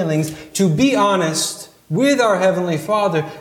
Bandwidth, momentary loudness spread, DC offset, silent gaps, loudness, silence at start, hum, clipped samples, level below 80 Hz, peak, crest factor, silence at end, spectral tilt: 17.5 kHz; 8 LU; under 0.1%; none; -17 LUFS; 0 s; none; under 0.1%; -56 dBFS; -4 dBFS; 14 dB; 0 s; -5 dB/octave